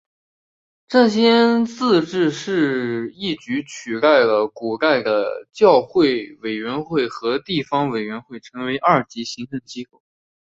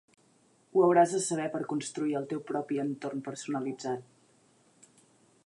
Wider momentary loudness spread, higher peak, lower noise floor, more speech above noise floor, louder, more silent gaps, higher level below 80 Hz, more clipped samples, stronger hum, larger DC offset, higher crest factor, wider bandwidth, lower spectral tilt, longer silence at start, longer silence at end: about the same, 15 LU vs 13 LU; first, -2 dBFS vs -12 dBFS; first, under -90 dBFS vs -66 dBFS; first, over 71 dB vs 36 dB; first, -19 LUFS vs -30 LUFS; neither; first, -62 dBFS vs -84 dBFS; neither; neither; neither; about the same, 18 dB vs 20 dB; second, 7.8 kHz vs 11.5 kHz; about the same, -5.5 dB/octave vs -5 dB/octave; first, 0.9 s vs 0.75 s; second, 0.6 s vs 1.45 s